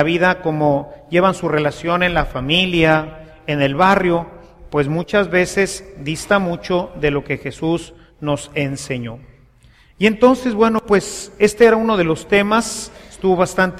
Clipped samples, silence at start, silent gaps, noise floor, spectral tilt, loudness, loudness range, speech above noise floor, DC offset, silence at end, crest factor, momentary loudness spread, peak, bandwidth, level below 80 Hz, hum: under 0.1%; 0 s; none; -49 dBFS; -5 dB/octave; -17 LUFS; 5 LU; 33 dB; under 0.1%; 0 s; 16 dB; 12 LU; 0 dBFS; 15 kHz; -40 dBFS; none